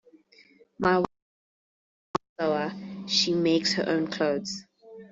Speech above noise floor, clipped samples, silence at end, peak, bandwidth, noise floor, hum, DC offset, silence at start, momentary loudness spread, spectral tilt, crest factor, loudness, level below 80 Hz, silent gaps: 33 dB; under 0.1%; 0.05 s; -8 dBFS; 8 kHz; -58 dBFS; none; under 0.1%; 0.8 s; 11 LU; -4 dB/octave; 20 dB; -27 LUFS; -64 dBFS; 1.22-2.14 s, 2.29-2.36 s